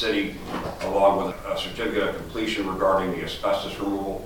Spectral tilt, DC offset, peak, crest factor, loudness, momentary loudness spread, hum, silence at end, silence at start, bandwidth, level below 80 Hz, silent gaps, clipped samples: -5 dB/octave; under 0.1%; -8 dBFS; 18 dB; -25 LUFS; 8 LU; none; 0 s; 0 s; 19 kHz; -44 dBFS; none; under 0.1%